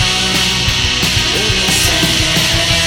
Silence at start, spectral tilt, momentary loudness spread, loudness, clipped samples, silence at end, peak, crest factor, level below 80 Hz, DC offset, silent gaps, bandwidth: 0 s; -2 dB/octave; 2 LU; -11 LUFS; under 0.1%; 0 s; 0 dBFS; 12 dB; -26 dBFS; under 0.1%; none; 19.5 kHz